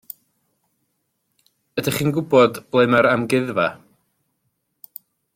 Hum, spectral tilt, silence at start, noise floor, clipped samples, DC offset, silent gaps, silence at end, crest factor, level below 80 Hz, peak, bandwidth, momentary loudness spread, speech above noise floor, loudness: none; -5.5 dB/octave; 1.75 s; -72 dBFS; under 0.1%; under 0.1%; none; 1.6 s; 18 dB; -60 dBFS; -4 dBFS; 16.5 kHz; 24 LU; 55 dB; -19 LUFS